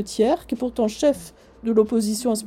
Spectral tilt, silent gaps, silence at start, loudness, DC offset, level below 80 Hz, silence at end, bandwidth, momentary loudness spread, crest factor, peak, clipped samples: -5 dB/octave; none; 0 s; -22 LUFS; under 0.1%; -50 dBFS; 0 s; 16 kHz; 8 LU; 16 dB; -6 dBFS; under 0.1%